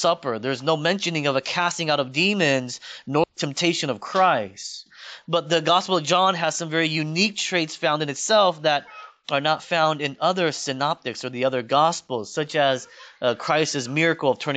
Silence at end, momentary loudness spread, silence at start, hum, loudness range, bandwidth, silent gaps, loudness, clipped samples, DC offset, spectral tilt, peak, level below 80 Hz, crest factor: 0 s; 9 LU; 0 s; none; 2 LU; 9.2 kHz; none; -22 LUFS; under 0.1%; under 0.1%; -3.5 dB/octave; -4 dBFS; -72 dBFS; 18 dB